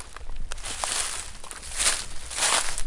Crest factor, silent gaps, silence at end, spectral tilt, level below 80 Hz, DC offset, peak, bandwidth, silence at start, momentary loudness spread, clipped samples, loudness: 22 dB; none; 0 s; 0.5 dB/octave; -38 dBFS; under 0.1%; -6 dBFS; 11.5 kHz; 0 s; 17 LU; under 0.1%; -26 LUFS